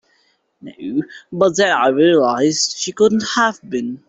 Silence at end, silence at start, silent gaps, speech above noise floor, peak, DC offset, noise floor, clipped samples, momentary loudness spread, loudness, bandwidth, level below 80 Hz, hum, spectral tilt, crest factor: 0.15 s; 0.65 s; none; 45 dB; -2 dBFS; under 0.1%; -61 dBFS; under 0.1%; 11 LU; -16 LUFS; 8.2 kHz; -60 dBFS; none; -3.5 dB/octave; 16 dB